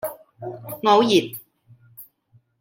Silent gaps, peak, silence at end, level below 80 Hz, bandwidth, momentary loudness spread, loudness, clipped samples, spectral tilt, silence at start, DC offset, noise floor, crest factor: none; -2 dBFS; 0.6 s; -70 dBFS; 17 kHz; 21 LU; -18 LUFS; under 0.1%; -4.5 dB/octave; 0.05 s; under 0.1%; -60 dBFS; 22 dB